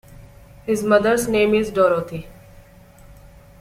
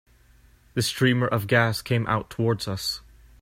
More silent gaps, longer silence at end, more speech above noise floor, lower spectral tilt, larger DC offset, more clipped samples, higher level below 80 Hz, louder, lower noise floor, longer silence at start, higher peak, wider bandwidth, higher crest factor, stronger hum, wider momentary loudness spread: neither; about the same, 0.5 s vs 0.4 s; second, 28 dB vs 32 dB; about the same, -5 dB/octave vs -5 dB/octave; neither; neither; first, -46 dBFS vs -52 dBFS; first, -18 LUFS vs -24 LUFS; second, -46 dBFS vs -56 dBFS; second, 0.1 s vs 0.75 s; first, -2 dBFS vs -6 dBFS; about the same, 16 kHz vs 16.5 kHz; about the same, 18 dB vs 20 dB; neither; first, 16 LU vs 8 LU